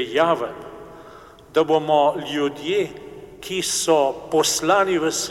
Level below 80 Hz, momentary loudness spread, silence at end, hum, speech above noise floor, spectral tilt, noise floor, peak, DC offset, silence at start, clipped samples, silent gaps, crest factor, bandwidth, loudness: -56 dBFS; 20 LU; 0 s; none; 24 dB; -3 dB/octave; -44 dBFS; -4 dBFS; under 0.1%; 0 s; under 0.1%; none; 18 dB; 16.5 kHz; -20 LUFS